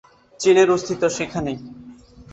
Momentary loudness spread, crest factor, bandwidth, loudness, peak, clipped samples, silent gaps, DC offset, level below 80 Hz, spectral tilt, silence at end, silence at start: 16 LU; 18 dB; 8.2 kHz; -19 LUFS; -4 dBFS; under 0.1%; none; under 0.1%; -52 dBFS; -4.5 dB/octave; 0.1 s; 0.4 s